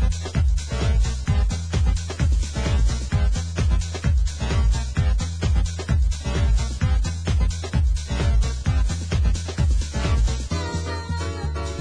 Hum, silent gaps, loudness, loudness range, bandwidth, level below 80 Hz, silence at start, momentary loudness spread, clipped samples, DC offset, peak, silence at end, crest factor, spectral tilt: none; none; -24 LUFS; 1 LU; 10.5 kHz; -22 dBFS; 0 s; 3 LU; under 0.1%; under 0.1%; -8 dBFS; 0 s; 12 dB; -5.5 dB/octave